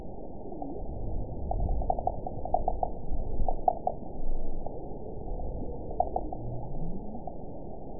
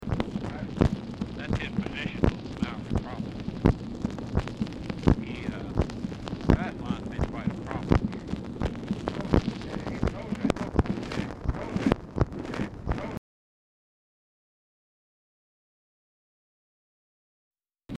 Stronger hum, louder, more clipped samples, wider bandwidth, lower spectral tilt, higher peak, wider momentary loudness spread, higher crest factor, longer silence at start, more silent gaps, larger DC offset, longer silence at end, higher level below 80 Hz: neither; second, -36 LUFS vs -30 LUFS; neither; second, 1 kHz vs 11 kHz; first, -14.5 dB/octave vs -7.5 dB/octave; about the same, -10 dBFS vs -8 dBFS; first, 11 LU vs 8 LU; about the same, 22 dB vs 22 dB; about the same, 0 s vs 0 s; second, none vs 13.18-17.51 s; first, 1% vs under 0.1%; about the same, 0 s vs 0 s; about the same, -34 dBFS vs -38 dBFS